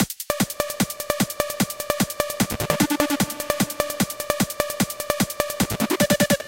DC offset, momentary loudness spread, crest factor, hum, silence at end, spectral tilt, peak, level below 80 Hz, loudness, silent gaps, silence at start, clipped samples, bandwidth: under 0.1%; 4 LU; 22 dB; none; 0 s; -3.5 dB/octave; -2 dBFS; -46 dBFS; -23 LUFS; none; 0 s; under 0.1%; 17.5 kHz